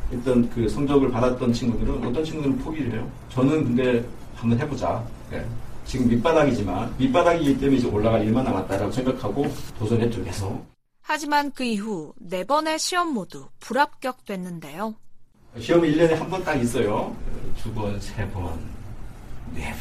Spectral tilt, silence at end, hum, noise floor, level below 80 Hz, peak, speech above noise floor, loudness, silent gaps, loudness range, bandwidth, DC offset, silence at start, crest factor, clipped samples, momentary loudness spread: -6 dB/octave; 0 s; none; -43 dBFS; -38 dBFS; -6 dBFS; 20 dB; -24 LUFS; none; 5 LU; 15 kHz; under 0.1%; 0 s; 18 dB; under 0.1%; 15 LU